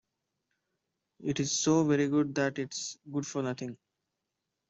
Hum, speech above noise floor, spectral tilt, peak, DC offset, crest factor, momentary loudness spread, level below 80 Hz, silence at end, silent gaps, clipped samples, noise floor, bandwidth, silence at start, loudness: none; 55 dB; -4.5 dB/octave; -14 dBFS; under 0.1%; 18 dB; 12 LU; -70 dBFS; 0.95 s; none; under 0.1%; -86 dBFS; 8.2 kHz; 1.2 s; -31 LUFS